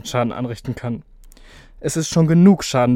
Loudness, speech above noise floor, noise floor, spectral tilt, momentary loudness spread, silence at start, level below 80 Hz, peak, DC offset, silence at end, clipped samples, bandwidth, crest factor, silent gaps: -18 LUFS; 27 dB; -43 dBFS; -6 dB/octave; 16 LU; 0.05 s; -46 dBFS; -2 dBFS; under 0.1%; 0 s; under 0.1%; 15 kHz; 16 dB; none